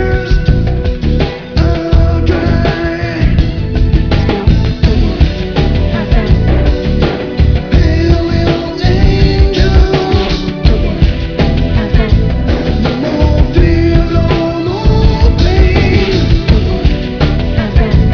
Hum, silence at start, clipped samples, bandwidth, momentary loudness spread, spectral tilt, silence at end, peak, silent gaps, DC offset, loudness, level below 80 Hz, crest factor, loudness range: none; 0 s; 1%; 5.4 kHz; 4 LU; -8 dB/octave; 0 s; 0 dBFS; none; 0.7%; -12 LUFS; -12 dBFS; 10 dB; 2 LU